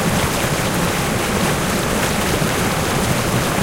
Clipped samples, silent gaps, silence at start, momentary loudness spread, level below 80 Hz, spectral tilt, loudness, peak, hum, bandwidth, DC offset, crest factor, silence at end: under 0.1%; none; 0 s; 1 LU; -32 dBFS; -4 dB/octave; -18 LUFS; -4 dBFS; none; 17 kHz; under 0.1%; 14 dB; 0 s